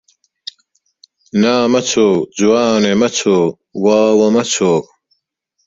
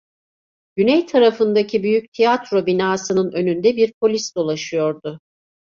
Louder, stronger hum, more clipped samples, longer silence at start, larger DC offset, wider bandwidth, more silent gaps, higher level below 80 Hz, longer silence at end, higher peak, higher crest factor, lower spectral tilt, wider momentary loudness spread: first, -13 LUFS vs -18 LUFS; neither; neither; first, 1.35 s vs 0.75 s; neither; about the same, 8 kHz vs 7.6 kHz; second, none vs 2.08-2.12 s, 3.94-4.01 s; first, -56 dBFS vs -62 dBFS; first, 0.85 s vs 0.5 s; first, 0 dBFS vs -4 dBFS; about the same, 14 dB vs 16 dB; about the same, -4.5 dB/octave vs -5 dB/octave; about the same, 9 LU vs 7 LU